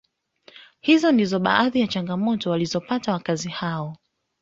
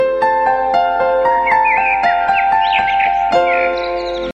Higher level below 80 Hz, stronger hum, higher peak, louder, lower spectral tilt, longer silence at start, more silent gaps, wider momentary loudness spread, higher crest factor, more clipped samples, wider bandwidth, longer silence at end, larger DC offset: second, -62 dBFS vs -42 dBFS; neither; about the same, -2 dBFS vs -2 dBFS; second, -22 LUFS vs -14 LUFS; about the same, -5.5 dB/octave vs -4.5 dB/octave; first, 0.55 s vs 0 s; neither; first, 10 LU vs 3 LU; first, 20 dB vs 12 dB; neither; second, 7.8 kHz vs 9 kHz; first, 0.45 s vs 0 s; neither